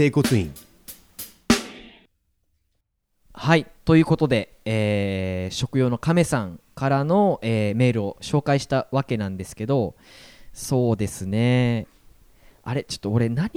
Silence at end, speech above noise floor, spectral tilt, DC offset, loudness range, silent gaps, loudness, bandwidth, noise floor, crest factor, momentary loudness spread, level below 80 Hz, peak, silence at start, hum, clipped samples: 0.05 s; 51 dB; -6 dB/octave; under 0.1%; 4 LU; none; -23 LUFS; 18.5 kHz; -73 dBFS; 20 dB; 15 LU; -48 dBFS; -2 dBFS; 0 s; none; under 0.1%